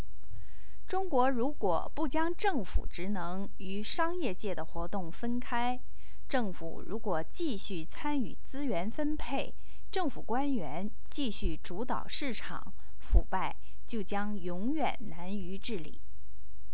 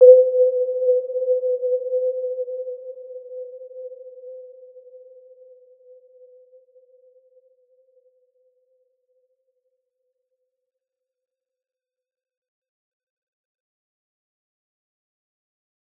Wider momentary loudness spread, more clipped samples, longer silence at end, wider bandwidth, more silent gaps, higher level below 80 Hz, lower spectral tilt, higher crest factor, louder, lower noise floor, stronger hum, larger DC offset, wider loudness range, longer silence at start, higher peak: second, 10 LU vs 22 LU; neither; second, 0 s vs 11 s; first, 4 kHz vs 0.8 kHz; neither; first, -42 dBFS vs under -90 dBFS; about the same, -9 dB/octave vs -8 dB/octave; about the same, 24 dB vs 24 dB; second, -36 LUFS vs -20 LUFS; second, -54 dBFS vs -85 dBFS; neither; first, 6% vs under 0.1%; second, 3 LU vs 24 LU; about the same, 0 s vs 0 s; second, -8 dBFS vs -2 dBFS